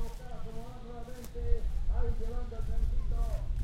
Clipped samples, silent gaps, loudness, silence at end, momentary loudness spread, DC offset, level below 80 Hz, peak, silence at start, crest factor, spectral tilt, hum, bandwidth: under 0.1%; none; -39 LUFS; 0 s; 10 LU; under 0.1%; -32 dBFS; -14 dBFS; 0 s; 16 dB; -7 dB/octave; none; 9.2 kHz